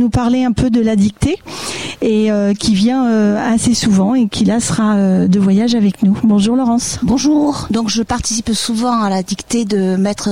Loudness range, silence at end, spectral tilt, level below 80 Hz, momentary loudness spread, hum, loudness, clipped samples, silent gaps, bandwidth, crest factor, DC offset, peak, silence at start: 2 LU; 0 s; -5 dB/octave; -36 dBFS; 5 LU; none; -14 LUFS; under 0.1%; none; 15.5 kHz; 12 dB; 0.6%; -2 dBFS; 0 s